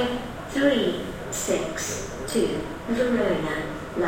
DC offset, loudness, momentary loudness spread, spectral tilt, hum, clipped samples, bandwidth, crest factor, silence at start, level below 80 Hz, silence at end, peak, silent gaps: under 0.1%; -26 LUFS; 9 LU; -4 dB/octave; none; under 0.1%; 16.5 kHz; 18 dB; 0 s; -44 dBFS; 0 s; -8 dBFS; none